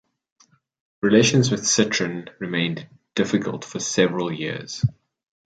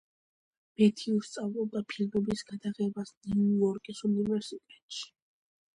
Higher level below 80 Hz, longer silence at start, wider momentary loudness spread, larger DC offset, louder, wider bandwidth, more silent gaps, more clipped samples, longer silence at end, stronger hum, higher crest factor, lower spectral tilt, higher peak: first, -56 dBFS vs -64 dBFS; first, 1.05 s vs 0.8 s; second, 12 LU vs 15 LU; neither; first, -22 LUFS vs -31 LUFS; second, 9.4 kHz vs 11 kHz; second, none vs 3.17-3.21 s, 4.82-4.89 s; neither; about the same, 0.65 s vs 0.7 s; neither; about the same, 20 dB vs 20 dB; second, -4 dB/octave vs -6.5 dB/octave; first, -2 dBFS vs -12 dBFS